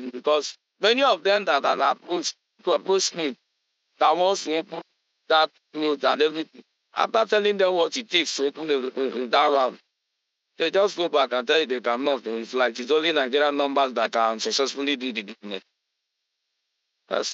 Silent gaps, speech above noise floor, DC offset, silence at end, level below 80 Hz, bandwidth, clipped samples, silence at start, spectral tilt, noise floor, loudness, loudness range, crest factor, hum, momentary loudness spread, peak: none; 57 dB; under 0.1%; 0 s; under -90 dBFS; 8.2 kHz; under 0.1%; 0 s; -2 dB/octave; -80 dBFS; -23 LUFS; 2 LU; 18 dB; none; 10 LU; -6 dBFS